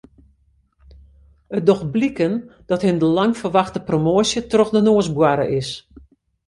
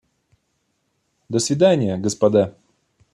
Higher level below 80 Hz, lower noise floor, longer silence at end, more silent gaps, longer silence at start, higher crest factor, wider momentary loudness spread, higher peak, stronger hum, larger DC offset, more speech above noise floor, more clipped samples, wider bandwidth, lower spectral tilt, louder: first, -50 dBFS vs -62 dBFS; second, -60 dBFS vs -70 dBFS; about the same, 0.65 s vs 0.65 s; neither; first, 1.5 s vs 1.3 s; about the same, 18 dB vs 18 dB; about the same, 9 LU vs 8 LU; about the same, -2 dBFS vs -4 dBFS; neither; neither; second, 42 dB vs 53 dB; neither; second, 11.5 kHz vs 13.5 kHz; about the same, -6 dB/octave vs -5.5 dB/octave; about the same, -18 LUFS vs -19 LUFS